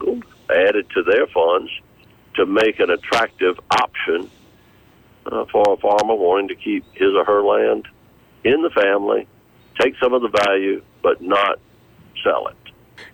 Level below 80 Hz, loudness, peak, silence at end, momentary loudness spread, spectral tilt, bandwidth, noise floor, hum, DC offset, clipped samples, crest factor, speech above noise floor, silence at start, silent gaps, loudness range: -56 dBFS; -18 LUFS; -8 dBFS; 0.05 s; 10 LU; -4.5 dB/octave; 17 kHz; -51 dBFS; none; under 0.1%; under 0.1%; 12 dB; 34 dB; 0 s; none; 2 LU